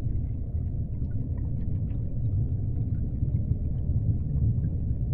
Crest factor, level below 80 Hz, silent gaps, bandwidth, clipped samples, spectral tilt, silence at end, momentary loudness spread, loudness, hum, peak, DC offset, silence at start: 14 dB; -32 dBFS; none; 2 kHz; under 0.1%; -14 dB/octave; 0 s; 5 LU; -30 LUFS; none; -14 dBFS; under 0.1%; 0 s